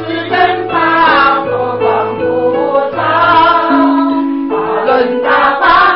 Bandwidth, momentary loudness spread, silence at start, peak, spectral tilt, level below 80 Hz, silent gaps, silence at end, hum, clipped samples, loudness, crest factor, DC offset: 5.8 kHz; 7 LU; 0 s; 0 dBFS; -9 dB/octave; -44 dBFS; none; 0 s; none; under 0.1%; -10 LUFS; 10 dB; 0.4%